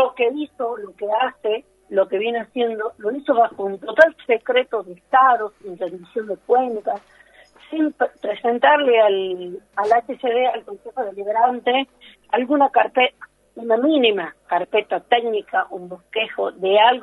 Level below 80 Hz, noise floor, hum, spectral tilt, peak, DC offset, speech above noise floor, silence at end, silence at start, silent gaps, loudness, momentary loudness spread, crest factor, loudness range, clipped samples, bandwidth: -68 dBFS; -50 dBFS; none; -5 dB/octave; 0 dBFS; under 0.1%; 30 dB; 0 s; 0 s; none; -20 LUFS; 13 LU; 20 dB; 3 LU; under 0.1%; 10.5 kHz